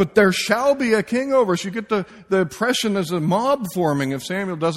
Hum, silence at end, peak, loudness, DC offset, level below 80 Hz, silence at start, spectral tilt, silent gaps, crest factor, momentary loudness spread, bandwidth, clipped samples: none; 0 s; -2 dBFS; -20 LUFS; under 0.1%; -56 dBFS; 0 s; -5 dB/octave; none; 18 dB; 7 LU; 16 kHz; under 0.1%